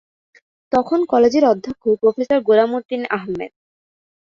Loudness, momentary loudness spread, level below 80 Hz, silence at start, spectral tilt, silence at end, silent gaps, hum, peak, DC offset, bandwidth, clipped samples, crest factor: -17 LUFS; 9 LU; -58 dBFS; 0.7 s; -6 dB/octave; 0.85 s; 2.85-2.89 s; none; -2 dBFS; under 0.1%; 7.2 kHz; under 0.1%; 16 dB